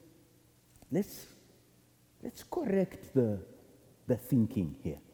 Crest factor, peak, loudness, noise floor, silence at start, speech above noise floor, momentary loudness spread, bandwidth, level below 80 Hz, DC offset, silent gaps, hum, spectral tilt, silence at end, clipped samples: 20 dB; -14 dBFS; -34 LUFS; -65 dBFS; 0.9 s; 32 dB; 18 LU; 19 kHz; -62 dBFS; under 0.1%; none; none; -8 dB/octave; 0.15 s; under 0.1%